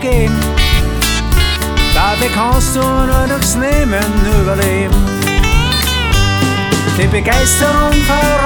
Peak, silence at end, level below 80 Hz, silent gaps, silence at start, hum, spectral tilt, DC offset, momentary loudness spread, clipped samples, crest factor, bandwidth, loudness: 0 dBFS; 0 s; -16 dBFS; none; 0 s; none; -4 dB/octave; under 0.1%; 3 LU; under 0.1%; 12 dB; 19.5 kHz; -12 LUFS